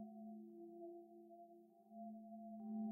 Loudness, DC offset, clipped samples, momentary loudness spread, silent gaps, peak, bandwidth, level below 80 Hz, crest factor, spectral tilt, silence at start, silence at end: -56 LUFS; under 0.1%; under 0.1%; 11 LU; none; -40 dBFS; 1.1 kHz; under -90 dBFS; 14 dB; -11 dB/octave; 0 s; 0 s